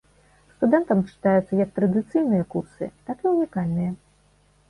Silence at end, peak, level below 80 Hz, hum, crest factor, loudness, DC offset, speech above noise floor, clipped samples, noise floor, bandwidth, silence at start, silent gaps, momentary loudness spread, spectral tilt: 0.75 s; -6 dBFS; -56 dBFS; 50 Hz at -55 dBFS; 18 dB; -23 LUFS; under 0.1%; 37 dB; under 0.1%; -60 dBFS; 11 kHz; 0.6 s; none; 11 LU; -10 dB/octave